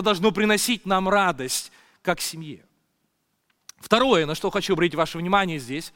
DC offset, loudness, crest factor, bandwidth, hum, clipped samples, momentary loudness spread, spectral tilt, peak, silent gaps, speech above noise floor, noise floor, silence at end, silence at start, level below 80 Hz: under 0.1%; -22 LUFS; 22 dB; 17 kHz; none; under 0.1%; 11 LU; -4 dB/octave; -2 dBFS; none; 50 dB; -73 dBFS; 0.05 s; 0 s; -52 dBFS